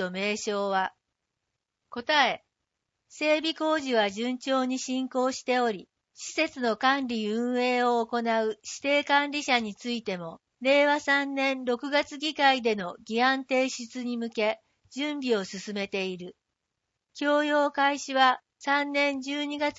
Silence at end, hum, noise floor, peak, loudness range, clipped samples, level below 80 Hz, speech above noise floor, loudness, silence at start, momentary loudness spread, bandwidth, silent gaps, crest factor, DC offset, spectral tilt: 0.05 s; none; -84 dBFS; -8 dBFS; 4 LU; under 0.1%; -76 dBFS; 57 dB; -27 LUFS; 0 s; 10 LU; 8 kHz; none; 20 dB; under 0.1%; -3 dB/octave